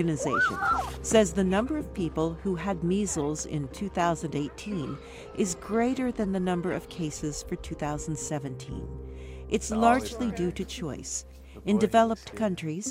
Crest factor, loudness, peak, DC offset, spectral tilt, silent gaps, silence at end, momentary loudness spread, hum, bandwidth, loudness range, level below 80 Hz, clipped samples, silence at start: 22 dB; -29 LUFS; -8 dBFS; under 0.1%; -5 dB/octave; none; 0 s; 13 LU; none; 16 kHz; 4 LU; -46 dBFS; under 0.1%; 0 s